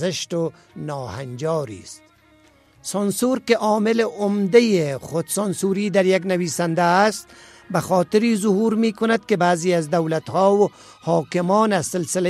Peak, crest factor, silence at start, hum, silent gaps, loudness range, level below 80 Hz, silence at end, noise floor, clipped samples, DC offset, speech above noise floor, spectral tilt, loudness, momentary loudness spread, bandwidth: -2 dBFS; 18 dB; 0 s; none; none; 4 LU; -62 dBFS; 0 s; -54 dBFS; under 0.1%; under 0.1%; 34 dB; -5 dB/octave; -20 LUFS; 12 LU; 15 kHz